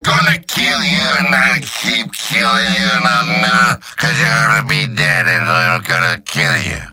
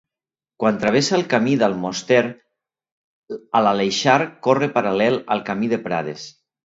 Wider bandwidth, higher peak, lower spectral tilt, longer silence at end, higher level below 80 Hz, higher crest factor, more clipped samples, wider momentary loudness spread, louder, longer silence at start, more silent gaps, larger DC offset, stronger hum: first, 17 kHz vs 8 kHz; about the same, 0 dBFS vs 0 dBFS; second, -3.5 dB/octave vs -5 dB/octave; second, 0 s vs 0.35 s; first, -42 dBFS vs -62 dBFS; second, 14 dB vs 20 dB; neither; second, 5 LU vs 10 LU; first, -12 LUFS vs -19 LUFS; second, 0 s vs 0.6 s; second, none vs 2.92-3.23 s; neither; neither